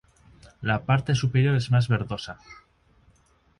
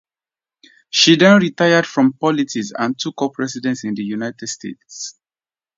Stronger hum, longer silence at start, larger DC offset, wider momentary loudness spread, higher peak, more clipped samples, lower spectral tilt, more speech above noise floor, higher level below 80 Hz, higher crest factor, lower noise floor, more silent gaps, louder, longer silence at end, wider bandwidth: neither; second, 0.6 s vs 0.95 s; neither; second, 13 LU vs 19 LU; second, -8 dBFS vs 0 dBFS; neither; first, -6.5 dB/octave vs -4 dB/octave; second, 38 dB vs over 73 dB; first, -52 dBFS vs -66 dBFS; about the same, 18 dB vs 18 dB; second, -62 dBFS vs under -90 dBFS; neither; second, -24 LUFS vs -16 LUFS; first, 1.05 s vs 0.65 s; first, 11 kHz vs 7.8 kHz